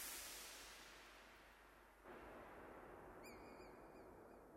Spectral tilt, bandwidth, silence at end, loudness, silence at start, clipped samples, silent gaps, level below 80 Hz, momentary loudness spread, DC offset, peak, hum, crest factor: -2 dB/octave; 16 kHz; 0 s; -58 LUFS; 0 s; under 0.1%; none; -74 dBFS; 12 LU; under 0.1%; -38 dBFS; none; 20 dB